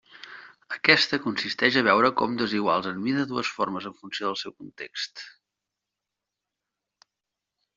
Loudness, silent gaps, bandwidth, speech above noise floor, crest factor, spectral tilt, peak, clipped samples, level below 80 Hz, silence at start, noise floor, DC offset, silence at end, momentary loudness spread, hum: -24 LUFS; none; 7.6 kHz; 61 dB; 24 dB; -1.5 dB/octave; -4 dBFS; under 0.1%; -70 dBFS; 0.15 s; -86 dBFS; under 0.1%; 2.5 s; 20 LU; none